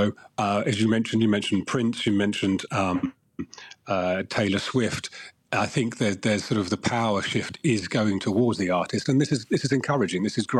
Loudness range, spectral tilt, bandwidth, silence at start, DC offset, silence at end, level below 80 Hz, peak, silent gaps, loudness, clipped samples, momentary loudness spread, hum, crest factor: 3 LU; -5.5 dB/octave; 12 kHz; 0 s; under 0.1%; 0 s; -60 dBFS; -12 dBFS; none; -25 LUFS; under 0.1%; 6 LU; none; 14 dB